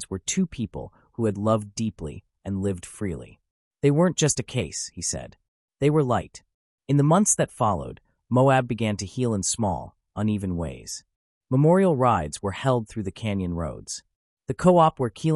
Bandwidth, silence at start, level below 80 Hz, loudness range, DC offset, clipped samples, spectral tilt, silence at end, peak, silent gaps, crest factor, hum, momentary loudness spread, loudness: 12 kHz; 0 s; -52 dBFS; 4 LU; under 0.1%; under 0.1%; -5.5 dB/octave; 0 s; -6 dBFS; 3.51-3.71 s, 5.48-5.68 s, 6.54-6.78 s, 11.16-11.41 s, 14.16-14.37 s; 18 dB; none; 16 LU; -24 LUFS